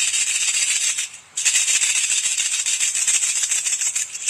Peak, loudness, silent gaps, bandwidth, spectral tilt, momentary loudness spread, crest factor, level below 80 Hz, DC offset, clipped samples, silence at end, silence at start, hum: -2 dBFS; -17 LUFS; none; 16 kHz; 5 dB/octave; 5 LU; 18 dB; -72 dBFS; under 0.1%; under 0.1%; 0 s; 0 s; none